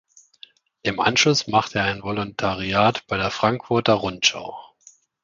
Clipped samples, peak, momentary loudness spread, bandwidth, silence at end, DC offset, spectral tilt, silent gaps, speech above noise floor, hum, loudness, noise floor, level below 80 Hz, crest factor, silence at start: under 0.1%; -2 dBFS; 10 LU; 7.6 kHz; 0.6 s; under 0.1%; -3.5 dB/octave; none; 33 dB; none; -21 LUFS; -54 dBFS; -52 dBFS; 22 dB; 0.85 s